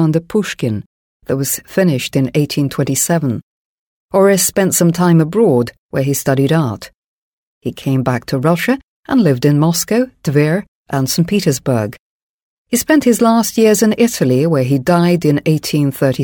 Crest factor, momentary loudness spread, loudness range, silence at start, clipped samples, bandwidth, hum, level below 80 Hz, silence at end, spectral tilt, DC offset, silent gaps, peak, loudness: 14 dB; 9 LU; 4 LU; 0 s; under 0.1%; 19.5 kHz; none; -50 dBFS; 0 s; -5.5 dB/octave; under 0.1%; 0.86-1.20 s, 3.43-4.09 s, 5.78-5.89 s, 6.95-7.61 s, 8.83-9.03 s, 10.68-10.85 s, 11.99-12.65 s; 0 dBFS; -14 LUFS